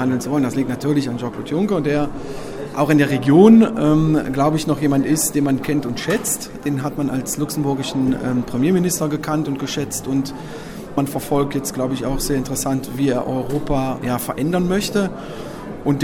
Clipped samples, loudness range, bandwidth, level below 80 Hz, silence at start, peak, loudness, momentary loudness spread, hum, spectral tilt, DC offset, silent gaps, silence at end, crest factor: under 0.1%; 7 LU; 17 kHz; -40 dBFS; 0 s; 0 dBFS; -19 LUFS; 10 LU; none; -5.5 dB/octave; under 0.1%; none; 0 s; 18 dB